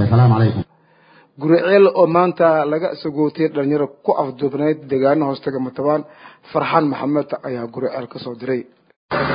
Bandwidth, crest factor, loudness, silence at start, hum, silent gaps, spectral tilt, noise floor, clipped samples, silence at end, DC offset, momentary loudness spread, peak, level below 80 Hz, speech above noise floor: 5.2 kHz; 18 dB; -18 LUFS; 0 s; none; 8.96-9.09 s; -13 dB/octave; -52 dBFS; under 0.1%; 0 s; under 0.1%; 12 LU; 0 dBFS; -50 dBFS; 35 dB